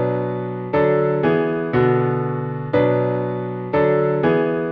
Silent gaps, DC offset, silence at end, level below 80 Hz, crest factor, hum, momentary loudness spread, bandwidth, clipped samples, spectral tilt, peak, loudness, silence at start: none; under 0.1%; 0 s; -52 dBFS; 16 dB; none; 7 LU; 5.2 kHz; under 0.1%; -10.5 dB/octave; -4 dBFS; -19 LUFS; 0 s